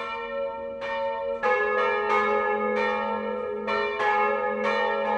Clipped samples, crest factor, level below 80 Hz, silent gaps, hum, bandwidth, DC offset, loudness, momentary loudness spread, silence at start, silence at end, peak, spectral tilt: under 0.1%; 16 dB; -60 dBFS; none; none; 9 kHz; under 0.1%; -26 LUFS; 8 LU; 0 s; 0 s; -10 dBFS; -4.5 dB/octave